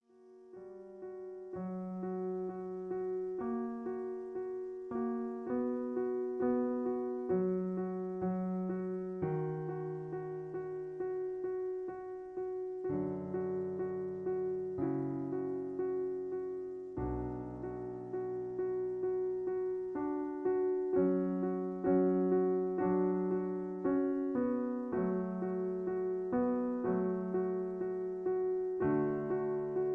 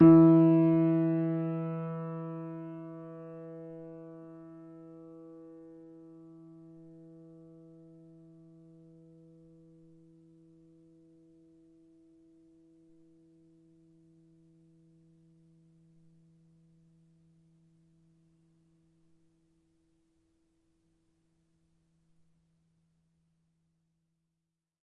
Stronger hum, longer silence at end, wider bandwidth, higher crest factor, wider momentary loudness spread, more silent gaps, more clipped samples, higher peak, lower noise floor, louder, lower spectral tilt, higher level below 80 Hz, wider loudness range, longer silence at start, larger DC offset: neither; second, 0 s vs 20.85 s; second, 2.8 kHz vs 3.2 kHz; second, 16 dB vs 24 dB; second, 9 LU vs 31 LU; neither; neither; second, -20 dBFS vs -8 dBFS; second, -59 dBFS vs -87 dBFS; second, -36 LUFS vs -27 LUFS; about the same, -11.5 dB/octave vs -12.5 dB/octave; first, -62 dBFS vs -68 dBFS; second, 7 LU vs 28 LU; first, 0.2 s vs 0 s; neither